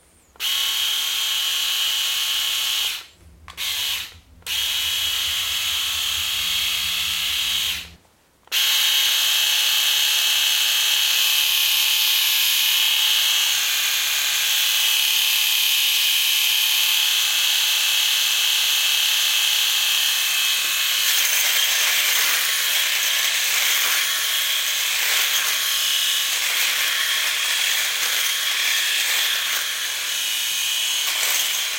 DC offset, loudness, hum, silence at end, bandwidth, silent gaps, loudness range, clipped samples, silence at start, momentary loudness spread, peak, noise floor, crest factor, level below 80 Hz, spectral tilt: under 0.1%; -17 LUFS; none; 0 s; 16.5 kHz; none; 5 LU; under 0.1%; 0.4 s; 5 LU; -4 dBFS; -57 dBFS; 16 dB; -58 dBFS; 3.5 dB/octave